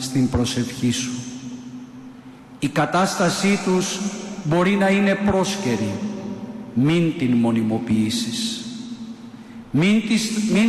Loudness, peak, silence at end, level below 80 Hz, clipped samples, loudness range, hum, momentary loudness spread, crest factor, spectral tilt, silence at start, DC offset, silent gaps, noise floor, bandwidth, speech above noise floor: -21 LUFS; -10 dBFS; 0 s; -48 dBFS; under 0.1%; 3 LU; none; 17 LU; 12 dB; -5 dB/octave; 0 s; under 0.1%; none; -41 dBFS; 13 kHz; 22 dB